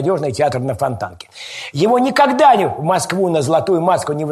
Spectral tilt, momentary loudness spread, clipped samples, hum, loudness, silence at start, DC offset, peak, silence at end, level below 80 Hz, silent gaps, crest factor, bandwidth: -5.5 dB/octave; 15 LU; under 0.1%; none; -15 LUFS; 0 s; under 0.1%; 0 dBFS; 0 s; -54 dBFS; none; 16 dB; 13 kHz